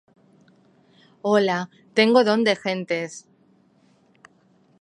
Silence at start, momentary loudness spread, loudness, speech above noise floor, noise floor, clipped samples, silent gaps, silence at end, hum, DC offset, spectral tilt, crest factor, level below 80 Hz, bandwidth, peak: 1.25 s; 13 LU; -21 LUFS; 39 dB; -59 dBFS; under 0.1%; none; 1.65 s; none; under 0.1%; -5 dB/octave; 20 dB; -78 dBFS; 11 kHz; -4 dBFS